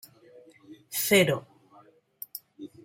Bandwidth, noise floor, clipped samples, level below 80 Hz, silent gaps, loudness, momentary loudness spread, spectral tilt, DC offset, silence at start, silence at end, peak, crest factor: 16.5 kHz; -58 dBFS; under 0.1%; -70 dBFS; none; -25 LUFS; 22 LU; -3.5 dB/octave; under 0.1%; 0.7 s; 0.2 s; -6 dBFS; 24 dB